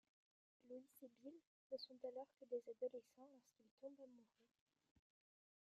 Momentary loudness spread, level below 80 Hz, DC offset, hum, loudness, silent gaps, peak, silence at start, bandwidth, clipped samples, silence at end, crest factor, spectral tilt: 15 LU; under -90 dBFS; under 0.1%; none; -56 LUFS; 1.47-1.70 s, 3.71-3.78 s; -38 dBFS; 0.65 s; 13 kHz; under 0.1%; 1.35 s; 20 dB; -4 dB/octave